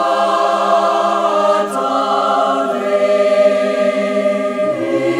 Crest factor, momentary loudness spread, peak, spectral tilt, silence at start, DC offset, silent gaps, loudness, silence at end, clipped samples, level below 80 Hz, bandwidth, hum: 12 dB; 4 LU; -2 dBFS; -4.5 dB/octave; 0 s; under 0.1%; none; -15 LUFS; 0 s; under 0.1%; -62 dBFS; 13 kHz; none